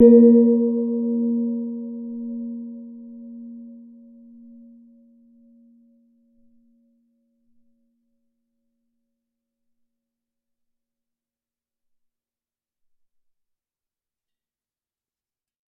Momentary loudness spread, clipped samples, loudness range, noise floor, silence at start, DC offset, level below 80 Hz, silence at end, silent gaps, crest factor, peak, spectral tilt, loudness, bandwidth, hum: 27 LU; under 0.1%; 25 LU; under -90 dBFS; 0 s; under 0.1%; -74 dBFS; 12 s; none; 22 dB; -2 dBFS; -12.5 dB/octave; -19 LUFS; 2 kHz; none